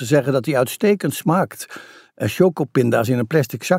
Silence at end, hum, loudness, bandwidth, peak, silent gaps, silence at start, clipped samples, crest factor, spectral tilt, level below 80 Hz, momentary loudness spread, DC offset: 0 s; none; -19 LUFS; 16 kHz; -2 dBFS; none; 0 s; under 0.1%; 16 dB; -6 dB/octave; -62 dBFS; 9 LU; under 0.1%